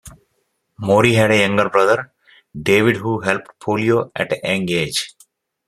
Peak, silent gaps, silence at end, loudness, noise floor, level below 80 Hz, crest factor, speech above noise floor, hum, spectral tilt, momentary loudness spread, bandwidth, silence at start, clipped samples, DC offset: 0 dBFS; none; 0.6 s; -17 LUFS; -69 dBFS; -54 dBFS; 18 dB; 52 dB; none; -5 dB/octave; 11 LU; 15 kHz; 0.05 s; under 0.1%; under 0.1%